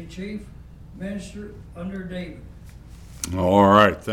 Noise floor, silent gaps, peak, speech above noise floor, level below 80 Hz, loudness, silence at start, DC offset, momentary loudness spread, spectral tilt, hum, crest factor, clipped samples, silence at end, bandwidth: -42 dBFS; none; -2 dBFS; 20 dB; -44 dBFS; -20 LUFS; 0 s; under 0.1%; 23 LU; -5.5 dB/octave; none; 22 dB; under 0.1%; 0 s; 18 kHz